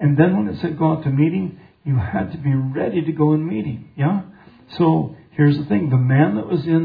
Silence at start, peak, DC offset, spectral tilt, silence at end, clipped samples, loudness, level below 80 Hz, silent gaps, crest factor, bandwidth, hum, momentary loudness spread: 0 s; -2 dBFS; under 0.1%; -11.5 dB/octave; 0 s; under 0.1%; -19 LUFS; -50 dBFS; none; 16 dB; 5 kHz; none; 10 LU